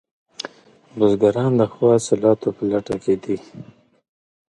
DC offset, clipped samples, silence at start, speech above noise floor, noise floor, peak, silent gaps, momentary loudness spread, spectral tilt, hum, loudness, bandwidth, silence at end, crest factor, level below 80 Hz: under 0.1%; under 0.1%; 0.45 s; 31 dB; -49 dBFS; -2 dBFS; none; 17 LU; -6.5 dB/octave; none; -19 LUFS; 11.5 kHz; 0.85 s; 18 dB; -56 dBFS